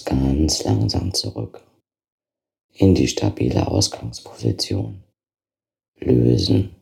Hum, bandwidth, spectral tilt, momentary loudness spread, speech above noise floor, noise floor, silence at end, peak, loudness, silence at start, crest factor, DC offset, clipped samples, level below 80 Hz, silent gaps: none; 14.5 kHz; -5.5 dB/octave; 14 LU; over 71 dB; under -90 dBFS; 0.1 s; -2 dBFS; -20 LUFS; 0 s; 18 dB; under 0.1%; under 0.1%; -36 dBFS; 2.12-2.18 s, 2.64-2.69 s, 5.88-5.93 s